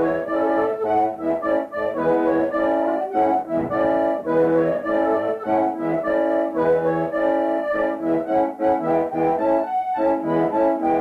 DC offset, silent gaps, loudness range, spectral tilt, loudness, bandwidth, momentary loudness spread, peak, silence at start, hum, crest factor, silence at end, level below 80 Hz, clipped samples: under 0.1%; none; 1 LU; -8.5 dB/octave; -21 LUFS; 5.2 kHz; 3 LU; -8 dBFS; 0 s; none; 12 dB; 0 s; -54 dBFS; under 0.1%